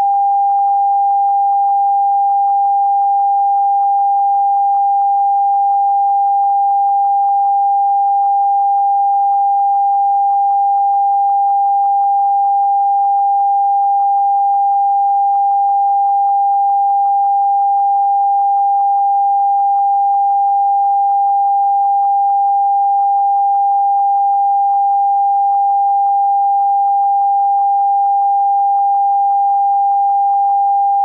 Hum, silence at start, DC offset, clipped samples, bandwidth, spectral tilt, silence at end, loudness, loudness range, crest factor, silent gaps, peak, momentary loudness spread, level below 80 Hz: none; 0 s; under 0.1%; under 0.1%; 1.4 kHz; -4 dB/octave; 0 s; -13 LUFS; 0 LU; 4 dB; none; -8 dBFS; 0 LU; -86 dBFS